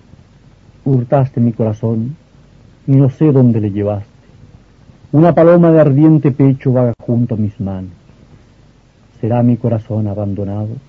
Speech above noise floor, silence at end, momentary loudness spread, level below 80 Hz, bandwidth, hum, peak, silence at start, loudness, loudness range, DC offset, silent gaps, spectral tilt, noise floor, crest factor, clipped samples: 35 dB; 0.1 s; 15 LU; -48 dBFS; 4.2 kHz; none; 0 dBFS; 0.85 s; -13 LUFS; 7 LU; under 0.1%; none; -11.5 dB/octave; -47 dBFS; 14 dB; under 0.1%